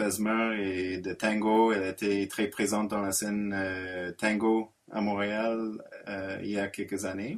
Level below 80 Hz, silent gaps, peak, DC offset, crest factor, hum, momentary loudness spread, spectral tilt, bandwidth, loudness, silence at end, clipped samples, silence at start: -66 dBFS; none; -12 dBFS; under 0.1%; 18 dB; none; 9 LU; -4.5 dB/octave; 15 kHz; -30 LUFS; 0 s; under 0.1%; 0 s